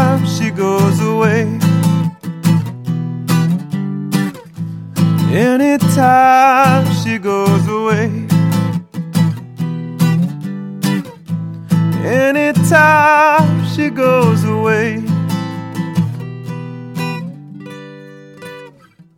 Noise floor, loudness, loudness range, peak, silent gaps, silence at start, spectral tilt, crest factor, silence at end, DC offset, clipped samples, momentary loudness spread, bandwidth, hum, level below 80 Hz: -44 dBFS; -14 LUFS; 7 LU; 0 dBFS; none; 0 s; -6.5 dB/octave; 14 dB; 0.5 s; under 0.1%; under 0.1%; 17 LU; 16.5 kHz; none; -56 dBFS